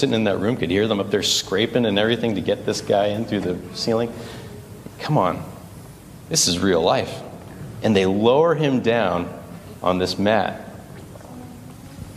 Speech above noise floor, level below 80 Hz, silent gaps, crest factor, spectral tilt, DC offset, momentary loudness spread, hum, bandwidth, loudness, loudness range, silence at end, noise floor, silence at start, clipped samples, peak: 20 dB; -52 dBFS; none; 18 dB; -4.5 dB/octave; under 0.1%; 22 LU; none; 15.5 kHz; -20 LUFS; 4 LU; 0 s; -40 dBFS; 0 s; under 0.1%; -2 dBFS